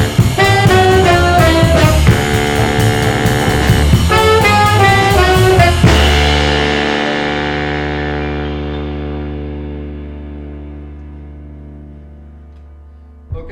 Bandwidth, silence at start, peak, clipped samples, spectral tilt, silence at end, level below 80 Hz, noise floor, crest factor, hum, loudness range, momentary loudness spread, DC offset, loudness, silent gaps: 18.5 kHz; 0 s; 0 dBFS; under 0.1%; -5.5 dB/octave; 0 s; -20 dBFS; -37 dBFS; 12 dB; none; 19 LU; 20 LU; under 0.1%; -11 LUFS; none